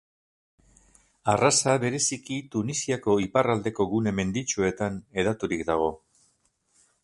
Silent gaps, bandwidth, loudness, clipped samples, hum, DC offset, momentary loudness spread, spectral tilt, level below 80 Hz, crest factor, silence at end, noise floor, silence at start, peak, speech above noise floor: none; 11.5 kHz; -26 LUFS; under 0.1%; none; under 0.1%; 9 LU; -4 dB/octave; -54 dBFS; 20 dB; 1.1 s; -69 dBFS; 1.25 s; -6 dBFS; 44 dB